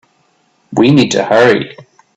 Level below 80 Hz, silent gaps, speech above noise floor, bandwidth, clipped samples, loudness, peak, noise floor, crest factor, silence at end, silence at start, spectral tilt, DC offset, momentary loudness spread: -52 dBFS; none; 46 dB; 8.4 kHz; under 0.1%; -11 LUFS; 0 dBFS; -56 dBFS; 12 dB; 0.35 s; 0.7 s; -5.5 dB/octave; under 0.1%; 10 LU